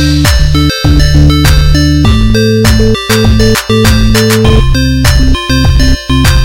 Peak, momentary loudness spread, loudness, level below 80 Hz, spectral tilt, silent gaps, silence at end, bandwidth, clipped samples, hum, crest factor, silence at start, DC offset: 0 dBFS; 3 LU; -7 LUFS; -10 dBFS; -5.5 dB/octave; none; 0 s; 17 kHz; 4%; none; 6 dB; 0 s; 5%